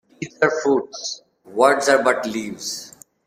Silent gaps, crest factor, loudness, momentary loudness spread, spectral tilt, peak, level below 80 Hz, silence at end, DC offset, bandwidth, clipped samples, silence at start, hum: none; 20 dB; -20 LUFS; 16 LU; -3 dB/octave; -2 dBFS; -66 dBFS; 0.4 s; under 0.1%; 16 kHz; under 0.1%; 0.2 s; none